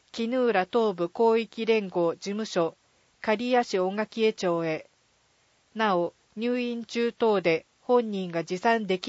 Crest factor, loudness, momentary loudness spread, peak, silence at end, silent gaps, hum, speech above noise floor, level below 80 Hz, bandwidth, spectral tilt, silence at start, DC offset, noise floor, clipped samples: 18 dB; -27 LUFS; 7 LU; -10 dBFS; 0 s; none; none; 40 dB; -74 dBFS; 8 kHz; -5.5 dB/octave; 0.15 s; under 0.1%; -66 dBFS; under 0.1%